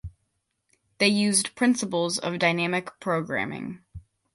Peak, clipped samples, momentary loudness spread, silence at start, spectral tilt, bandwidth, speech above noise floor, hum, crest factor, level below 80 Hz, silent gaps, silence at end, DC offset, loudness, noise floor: -8 dBFS; under 0.1%; 14 LU; 0.05 s; -3.5 dB/octave; 11.5 kHz; 51 dB; none; 20 dB; -54 dBFS; none; 0.35 s; under 0.1%; -24 LUFS; -76 dBFS